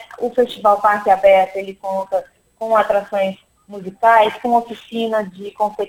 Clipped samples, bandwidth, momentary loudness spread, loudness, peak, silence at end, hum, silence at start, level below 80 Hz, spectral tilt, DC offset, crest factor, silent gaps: under 0.1%; 16.5 kHz; 15 LU; -17 LUFS; 0 dBFS; 0 s; none; 0 s; -56 dBFS; -5 dB/octave; under 0.1%; 16 dB; none